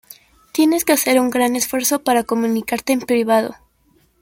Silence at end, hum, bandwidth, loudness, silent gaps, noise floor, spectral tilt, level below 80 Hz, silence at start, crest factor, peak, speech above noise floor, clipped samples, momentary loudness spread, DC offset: 0.7 s; none; 17 kHz; -17 LUFS; none; -58 dBFS; -3 dB/octave; -58 dBFS; 0.55 s; 16 dB; -2 dBFS; 41 dB; under 0.1%; 5 LU; under 0.1%